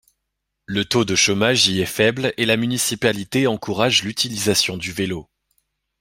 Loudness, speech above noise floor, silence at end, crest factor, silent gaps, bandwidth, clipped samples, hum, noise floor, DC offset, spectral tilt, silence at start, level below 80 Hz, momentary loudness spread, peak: -19 LUFS; 58 dB; 0.8 s; 20 dB; none; 16.5 kHz; under 0.1%; none; -78 dBFS; under 0.1%; -3 dB/octave; 0.7 s; -54 dBFS; 9 LU; -2 dBFS